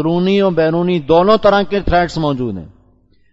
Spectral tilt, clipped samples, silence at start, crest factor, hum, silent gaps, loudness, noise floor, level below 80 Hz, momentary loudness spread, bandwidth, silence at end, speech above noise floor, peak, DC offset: -7.5 dB/octave; under 0.1%; 0 s; 14 dB; none; none; -14 LUFS; -52 dBFS; -34 dBFS; 9 LU; 8 kHz; 0.65 s; 38 dB; 0 dBFS; under 0.1%